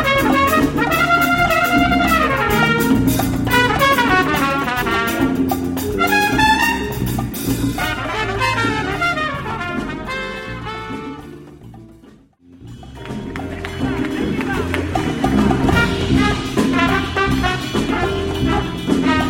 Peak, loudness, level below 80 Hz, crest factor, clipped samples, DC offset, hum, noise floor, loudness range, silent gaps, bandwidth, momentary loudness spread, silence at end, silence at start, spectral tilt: -2 dBFS; -17 LUFS; -32 dBFS; 16 dB; under 0.1%; under 0.1%; none; -46 dBFS; 13 LU; none; 16.5 kHz; 13 LU; 0 s; 0 s; -5 dB/octave